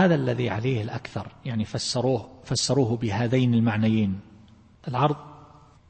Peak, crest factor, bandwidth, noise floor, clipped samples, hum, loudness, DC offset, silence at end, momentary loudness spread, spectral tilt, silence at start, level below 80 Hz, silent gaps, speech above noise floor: -8 dBFS; 16 dB; 8.8 kHz; -52 dBFS; under 0.1%; none; -25 LUFS; under 0.1%; 0.45 s; 12 LU; -6 dB/octave; 0 s; -56 dBFS; none; 28 dB